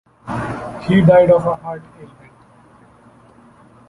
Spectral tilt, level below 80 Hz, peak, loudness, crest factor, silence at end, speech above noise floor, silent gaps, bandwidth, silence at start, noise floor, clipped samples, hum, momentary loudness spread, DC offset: -8.5 dB/octave; -46 dBFS; -2 dBFS; -15 LUFS; 16 dB; 1.85 s; 34 dB; none; 11 kHz; 0.25 s; -48 dBFS; under 0.1%; none; 19 LU; under 0.1%